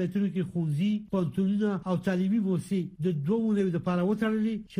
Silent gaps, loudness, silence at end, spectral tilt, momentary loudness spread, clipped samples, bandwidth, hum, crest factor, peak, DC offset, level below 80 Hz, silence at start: none; -28 LUFS; 0 s; -8.5 dB/octave; 3 LU; under 0.1%; 11.5 kHz; none; 12 dB; -16 dBFS; under 0.1%; -62 dBFS; 0 s